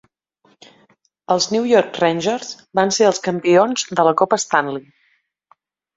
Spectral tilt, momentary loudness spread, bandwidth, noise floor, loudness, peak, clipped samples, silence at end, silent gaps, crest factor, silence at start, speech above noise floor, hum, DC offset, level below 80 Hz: -3.5 dB/octave; 8 LU; 8 kHz; -63 dBFS; -17 LUFS; -2 dBFS; under 0.1%; 1.15 s; none; 18 dB; 1.3 s; 47 dB; none; under 0.1%; -64 dBFS